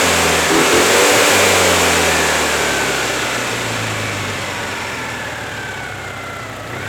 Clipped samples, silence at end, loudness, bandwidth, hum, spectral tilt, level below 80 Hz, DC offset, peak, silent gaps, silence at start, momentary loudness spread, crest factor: under 0.1%; 0 s; -14 LUFS; 19.5 kHz; none; -2 dB/octave; -42 dBFS; under 0.1%; -2 dBFS; none; 0 s; 15 LU; 14 dB